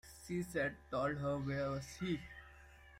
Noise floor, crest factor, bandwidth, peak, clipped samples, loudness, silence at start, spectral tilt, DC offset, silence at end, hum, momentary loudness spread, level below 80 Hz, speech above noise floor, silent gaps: -60 dBFS; 16 dB; 16 kHz; -26 dBFS; under 0.1%; -40 LUFS; 0.05 s; -6 dB/octave; under 0.1%; 0 s; none; 19 LU; -60 dBFS; 20 dB; none